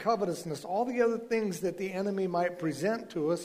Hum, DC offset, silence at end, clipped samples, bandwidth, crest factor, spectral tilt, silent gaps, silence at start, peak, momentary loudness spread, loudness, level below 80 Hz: none; under 0.1%; 0 s; under 0.1%; 15.5 kHz; 16 dB; -6 dB/octave; none; 0 s; -14 dBFS; 5 LU; -32 LUFS; -70 dBFS